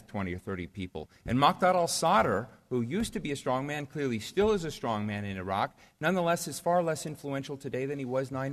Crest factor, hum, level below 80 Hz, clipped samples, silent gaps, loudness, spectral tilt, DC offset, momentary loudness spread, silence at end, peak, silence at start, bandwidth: 20 dB; none; -56 dBFS; under 0.1%; none; -30 LUFS; -5 dB/octave; under 0.1%; 11 LU; 0 s; -10 dBFS; 0.1 s; 13.5 kHz